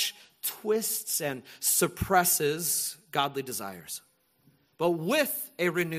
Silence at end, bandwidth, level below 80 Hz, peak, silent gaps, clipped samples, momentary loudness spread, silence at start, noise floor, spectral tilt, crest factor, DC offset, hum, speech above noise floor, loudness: 0 s; 15.5 kHz; -56 dBFS; -8 dBFS; none; under 0.1%; 11 LU; 0 s; -66 dBFS; -2.5 dB/octave; 22 dB; under 0.1%; none; 37 dB; -28 LUFS